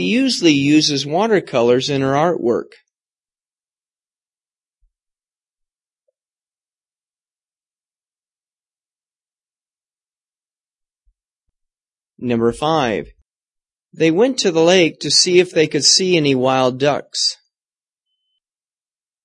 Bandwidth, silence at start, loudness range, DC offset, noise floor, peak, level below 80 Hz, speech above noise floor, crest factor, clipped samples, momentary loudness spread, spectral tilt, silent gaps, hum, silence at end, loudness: 11.5 kHz; 0 s; 11 LU; under 0.1%; under -90 dBFS; 0 dBFS; -58 dBFS; over 75 dB; 20 dB; under 0.1%; 7 LU; -3.5 dB/octave; none; none; 1.9 s; -15 LUFS